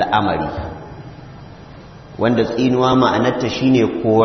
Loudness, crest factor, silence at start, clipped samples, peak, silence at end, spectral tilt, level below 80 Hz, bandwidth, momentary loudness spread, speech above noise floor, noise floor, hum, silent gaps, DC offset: -16 LUFS; 16 dB; 0 s; under 0.1%; -2 dBFS; 0 s; -6.5 dB/octave; -44 dBFS; 6.4 kHz; 23 LU; 22 dB; -38 dBFS; none; none; under 0.1%